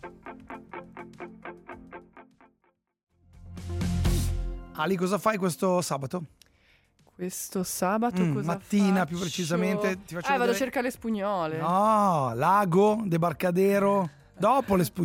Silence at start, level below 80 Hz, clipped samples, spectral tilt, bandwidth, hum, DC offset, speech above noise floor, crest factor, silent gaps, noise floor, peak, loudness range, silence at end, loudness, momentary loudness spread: 0.05 s; -44 dBFS; under 0.1%; -6 dB/octave; 16.5 kHz; none; under 0.1%; 46 dB; 16 dB; 3.03-3.07 s; -72 dBFS; -10 dBFS; 11 LU; 0 s; -26 LUFS; 20 LU